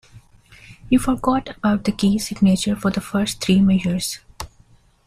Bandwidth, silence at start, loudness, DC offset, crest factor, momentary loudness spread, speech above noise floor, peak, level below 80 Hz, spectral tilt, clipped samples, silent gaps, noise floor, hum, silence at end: 14.5 kHz; 0.15 s; -20 LUFS; under 0.1%; 16 dB; 12 LU; 35 dB; -4 dBFS; -42 dBFS; -5.5 dB/octave; under 0.1%; none; -53 dBFS; none; 0.6 s